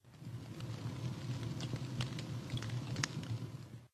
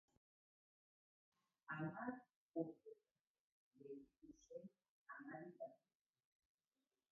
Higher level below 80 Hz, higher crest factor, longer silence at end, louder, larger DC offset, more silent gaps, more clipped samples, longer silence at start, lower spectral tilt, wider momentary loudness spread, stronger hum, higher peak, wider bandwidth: first, -64 dBFS vs under -90 dBFS; about the same, 28 dB vs 24 dB; second, 0.05 s vs 1.35 s; first, -43 LUFS vs -54 LUFS; neither; second, none vs 2.36-2.49 s, 3.21-3.71 s, 4.89-5.06 s; neither; second, 0.05 s vs 1.7 s; first, -5 dB/octave vs -3.5 dB/octave; second, 9 LU vs 17 LU; neither; first, -16 dBFS vs -32 dBFS; first, 13.5 kHz vs 3.2 kHz